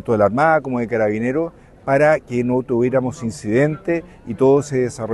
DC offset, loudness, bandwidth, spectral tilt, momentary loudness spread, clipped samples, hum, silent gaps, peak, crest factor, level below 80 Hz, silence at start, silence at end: under 0.1%; -18 LUFS; 12 kHz; -7.5 dB/octave; 9 LU; under 0.1%; none; none; -2 dBFS; 16 dB; -50 dBFS; 0.05 s; 0 s